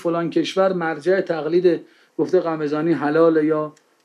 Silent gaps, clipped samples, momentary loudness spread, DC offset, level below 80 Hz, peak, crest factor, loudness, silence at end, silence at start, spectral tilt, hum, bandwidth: none; under 0.1%; 9 LU; under 0.1%; -76 dBFS; -4 dBFS; 16 dB; -20 LUFS; 0.35 s; 0 s; -7 dB/octave; none; 10 kHz